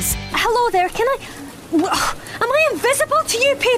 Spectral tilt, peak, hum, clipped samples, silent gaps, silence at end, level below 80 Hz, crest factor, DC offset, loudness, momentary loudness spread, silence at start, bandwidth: -2.5 dB/octave; -6 dBFS; none; under 0.1%; none; 0 s; -40 dBFS; 12 dB; under 0.1%; -18 LUFS; 7 LU; 0 s; 16 kHz